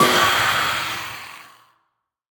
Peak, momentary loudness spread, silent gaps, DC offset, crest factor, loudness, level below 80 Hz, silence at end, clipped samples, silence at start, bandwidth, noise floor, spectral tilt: -2 dBFS; 19 LU; none; under 0.1%; 18 dB; -18 LUFS; -56 dBFS; 0.95 s; under 0.1%; 0 s; over 20 kHz; -73 dBFS; -2 dB/octave